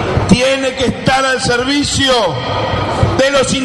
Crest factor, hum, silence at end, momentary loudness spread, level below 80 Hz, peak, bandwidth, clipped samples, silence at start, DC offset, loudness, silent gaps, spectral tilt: 14 dB; none; 0 s; 5 LU; -30 dBFS; 0 dBFS; 12 kHz; under 0.1%; 0 s; under 0.1%; -13 LUFS; none; -4 dB/octave